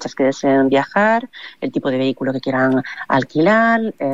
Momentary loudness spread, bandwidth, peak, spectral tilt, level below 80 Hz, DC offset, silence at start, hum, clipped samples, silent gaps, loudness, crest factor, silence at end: 8 LU; 7.8 kHz; -4 dBFS; -6 dB/octave; -60 dBFS; 0.4%; 0 s; none; under 0.1%; none; -17 LUFS; 12 dB; 0 s